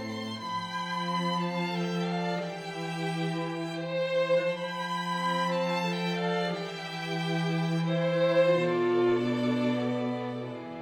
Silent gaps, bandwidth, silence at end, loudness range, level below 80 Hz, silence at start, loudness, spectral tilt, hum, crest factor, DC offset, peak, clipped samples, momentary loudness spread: none; 12.5 kHz; 0 s; 4 LU; -72 dBFS; 0 s; -30 LUFS; -6 dB/octave; none; 16 dB; under 0.1%; -14 dBFS; under 0.1%; 9 LU